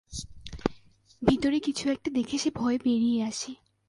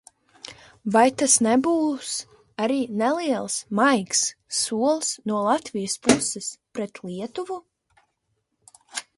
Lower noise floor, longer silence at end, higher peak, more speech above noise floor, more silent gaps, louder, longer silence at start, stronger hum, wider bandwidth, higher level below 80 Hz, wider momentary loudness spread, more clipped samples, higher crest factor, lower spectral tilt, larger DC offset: second, -54 dBFS vs -75 dBFS; first, 0.35 s vs 0.15 s; second, -8 dBFS vs -2 dBFS; second, 28 dB vs 52 dB; neither; second, -28 LUFS vs -23 LUFS; second, 0.1 s vs 0.45 s; neither; about the same, 11.5 kHz vs 12 kHz; first, -50 dBFS vs -64 dBFS; second, 13 LU vs 16 LU; neither; about the same, 22 dB vs 22 dB; first, -4.5 dB/octave vs -3 dB/octave; neither